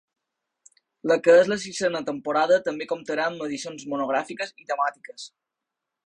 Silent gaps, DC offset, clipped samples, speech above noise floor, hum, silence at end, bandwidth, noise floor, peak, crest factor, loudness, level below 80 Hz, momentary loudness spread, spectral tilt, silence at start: none; under 0.1%; under 0.1%; 61 dB; none; 0.8 s; 10.5 kHz; -85 dBFS; -6 dBFS; 18 dB; -24 LUFS; -70 dBFS; 16 LU; -4 dB/octave; 1.05 s